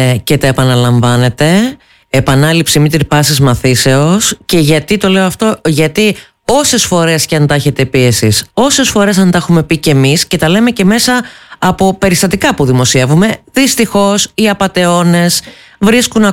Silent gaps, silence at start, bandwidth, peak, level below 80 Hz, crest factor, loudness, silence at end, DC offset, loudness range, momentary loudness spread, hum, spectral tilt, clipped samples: none; 0 s; 17 kHz; 0 dBFS; -36 dBFS; 10 dB; -9 LUFS; 0 s; under 0.1%; 1 LU; 3 LU; none; -4.5 dB/octave; under 0.1%